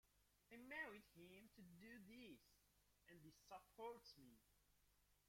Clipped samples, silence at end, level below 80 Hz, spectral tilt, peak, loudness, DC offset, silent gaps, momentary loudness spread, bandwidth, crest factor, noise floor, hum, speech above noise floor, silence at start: under 0.1%; 0 s; -84 dBFS; -4.5 dB/octave; -42 dBFS; -61 LUFS; under 0.1%; none; 14 LU; 16.5 kHz; 22 dB; -81 dBFS; 50 Hz at -85 dBFS; 19 dB; 0.05 s